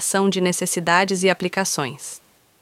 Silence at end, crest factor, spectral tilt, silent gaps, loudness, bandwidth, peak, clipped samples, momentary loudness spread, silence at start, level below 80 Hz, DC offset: 0.45 s; 18 dB; -3.5 dB/octave; none; -20 LUFS; 16 kHz; -2 dBFS; under 0.1%; 16 LU; 0 s; -66 dBFS; under 0.1%